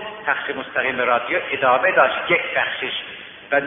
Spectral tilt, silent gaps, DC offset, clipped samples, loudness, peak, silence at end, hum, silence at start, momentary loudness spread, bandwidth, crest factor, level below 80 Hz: -8.5 dB/octave; none; under 0.1%; under 0.1%; -19 LUFS; -2 dBFS; 0 s; none; 0 s; 10 LU; 3.8 kHz; 18 dB; -62 dBFS